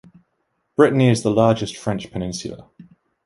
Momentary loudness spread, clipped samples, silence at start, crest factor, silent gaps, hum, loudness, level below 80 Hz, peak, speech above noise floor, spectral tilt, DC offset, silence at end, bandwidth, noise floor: 15 LU; under 0.1%; 0.8 s; 20 dB; none; none; -19 LUFS; -50 dBFS; -2 dBFS; 53 dB; -6.5 dB/octave; under 0.1%; 0.45 s; 11.5 kHz; -71 dBFS